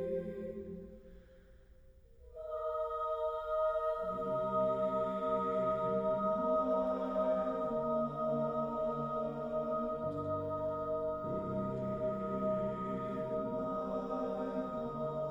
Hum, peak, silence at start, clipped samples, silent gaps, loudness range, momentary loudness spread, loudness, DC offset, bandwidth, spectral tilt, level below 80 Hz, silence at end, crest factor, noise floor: none; -22 dBFS; 0 s; under 0.1%; none; 5 LU; 6 LU; -36 LUFS; under 0.1%; 7.2 kHz; -9 dB/octave; -60 dBFS; 0 s; 14 dB; -59 dBFS